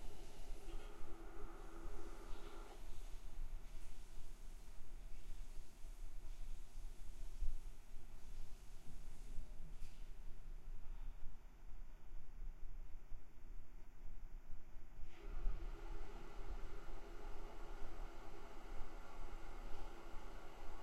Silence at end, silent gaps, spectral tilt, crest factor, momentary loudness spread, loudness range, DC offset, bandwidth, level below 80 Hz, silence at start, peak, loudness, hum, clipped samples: 0 s; none; -5 dB/octave; 16 dB; 7 LU; 5 LU; under 0.1%; 11 kHz; -50 dBFS; 0 s; -26 dBFS; -58 LUFS; none; under 0.1%